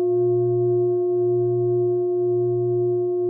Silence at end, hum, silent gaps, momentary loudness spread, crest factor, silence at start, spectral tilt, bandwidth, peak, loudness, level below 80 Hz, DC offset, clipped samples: 0 s; none; none; 2 LU; 6 dB; 0 s; -17.5 dB/octave; 1.2 kHz; -14 dBFS; -21 LUFS; -74 dBFS; under 0.1%; under 0.1%